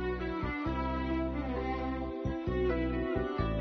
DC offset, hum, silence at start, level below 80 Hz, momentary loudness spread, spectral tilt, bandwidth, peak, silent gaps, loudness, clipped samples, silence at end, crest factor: under 0.1%; none; 0 s; -40 dBFS; 4 LU; -6.5 dB/octave; 6.2 kHz; -20 dBFS; none; -34 LUFS; under 0.1%; 0 s; 14 dB